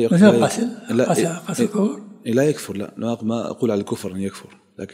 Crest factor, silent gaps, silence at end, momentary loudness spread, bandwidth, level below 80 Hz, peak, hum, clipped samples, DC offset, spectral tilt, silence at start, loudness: 20 dB; none; 0.1 s; 15 LU; 16 kHz; -66 dBFS; 0 dBFS; none; under 0.1%; under 0.1%; -6 dB/octave; 0 s; -20 LUFS